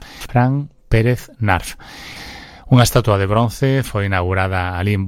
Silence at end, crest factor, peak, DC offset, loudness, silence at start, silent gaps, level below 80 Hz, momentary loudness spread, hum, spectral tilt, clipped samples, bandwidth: 0 s; 16 dB; 0 dBFS; under 0.1%; -17 LUFS; 0 s; none; -34 dBFS; 18 LU; none; -6 dB/octave; under 0.1%; 16.5 kHz